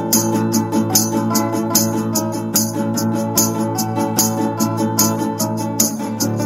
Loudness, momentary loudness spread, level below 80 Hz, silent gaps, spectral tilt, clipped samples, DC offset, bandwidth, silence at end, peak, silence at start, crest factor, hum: -17 LUFS; 5 LU; -54 dBFS; none; -4 dB/octave; under 0.1%; under 0.1%; 16.5 kHz; 0 s; 0 dBFS; 0 s; 18 dB; none